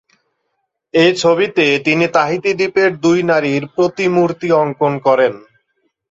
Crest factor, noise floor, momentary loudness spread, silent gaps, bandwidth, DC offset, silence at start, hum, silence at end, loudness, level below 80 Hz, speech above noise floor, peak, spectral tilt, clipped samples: 14 dB; -71 dBFS; 4 LU; none; 8 kHz; under 0.1%; 0.95 s; none; 0.7 s; -14 LUFS; -58 dBFS; 57 dB; -2 dBFS; -5.5 dB/octave; under 0.1%